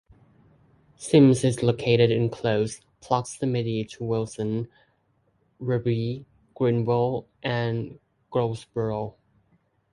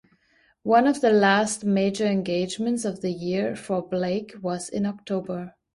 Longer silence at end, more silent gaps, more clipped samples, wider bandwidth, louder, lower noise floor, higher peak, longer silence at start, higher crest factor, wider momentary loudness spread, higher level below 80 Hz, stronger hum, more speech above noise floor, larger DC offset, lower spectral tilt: first, 0.85 s vs 0.25 s; neither; neither; about the same, 11.5 kHz vs 11.5 kHz; about the same, -25 LUFS vs -24 LUFS; first, -68 dBFS vs -63 dBFS; first, -4 dBFS vs -8 dBFS; first, 1 s vs 0.65 s; about the same, 20 dB vs 16 dB; about the same, 13 LU vs 11 LU; first, -58 dBFS vs -64 dBFS; neither; first, 44 dB vs 40 dB; neither; first, -6.5 dB/octave vs -5 dB/octave